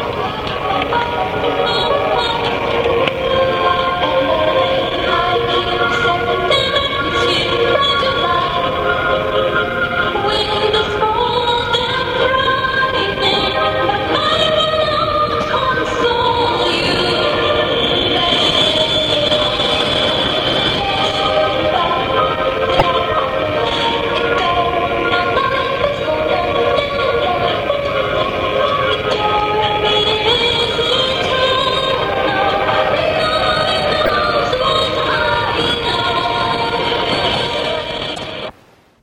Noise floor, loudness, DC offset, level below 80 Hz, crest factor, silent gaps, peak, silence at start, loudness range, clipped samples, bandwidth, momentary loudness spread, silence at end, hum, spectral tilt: -48 dBFS; -15 LUFS; under 0.1%; -36 dBFS; 16 dB; none; 0 dBFS; 0 s; 2 LU; under 0.1%; 16.5 kHz; 4 LU; 0.5 s; none; -4.5 dB/octave